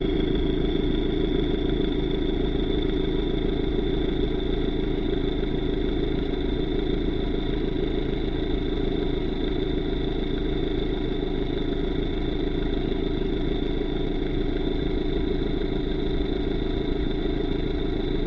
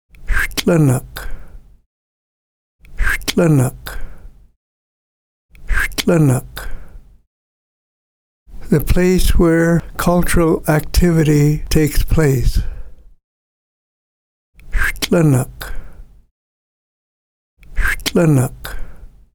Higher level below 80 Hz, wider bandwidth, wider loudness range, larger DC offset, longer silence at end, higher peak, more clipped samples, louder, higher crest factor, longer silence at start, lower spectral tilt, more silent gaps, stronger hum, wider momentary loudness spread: about the same, -28 dBFS vs -24 dBFS; second, 5.8 kHz vs over 20 kHz; second, 2 LU vs 6 LU; neither; second, 0 s vs 0.3 s; second, -10 dBFS vs 0 dBFS; neither; second, -27 LUFS vs -16 LUFS; about the same, 14 dB vs 16 dB; second, 0 s vs 0.2 s; first, -9 dB/octave vs -6 dB/octave; second, none vs 1.86-2.79 s, 4.56-5.49 s, 7.27-8.46 s, 13.24-14.53 s, 16.31-17.57 s; neither; second, 3 LU vs 18 LU